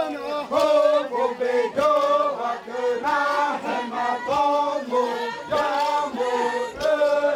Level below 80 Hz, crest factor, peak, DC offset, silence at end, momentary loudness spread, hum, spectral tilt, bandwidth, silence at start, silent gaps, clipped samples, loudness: -60 dBFS; 14 dB; -8 dBFS; under 0.1%; 0 s; 7 LU; none; -3.5 dB/octave; 13.5 kHz; 0 s; none; under 0.1%; -22 LUFS